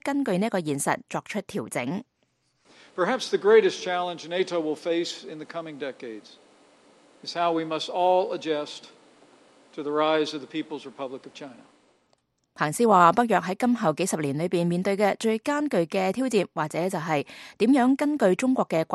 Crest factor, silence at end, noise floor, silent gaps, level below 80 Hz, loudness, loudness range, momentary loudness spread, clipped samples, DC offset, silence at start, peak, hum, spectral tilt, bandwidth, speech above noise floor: 22 dB; 0 s; -71 dBFS; none; -72 dBFS; -25 LUFS; 8 LU; 17 LU; under 0.1%; under 0.1%; 0.05 s; -4 dBFS; none; -5 dB/octave; 12.5 kHz; 46 dB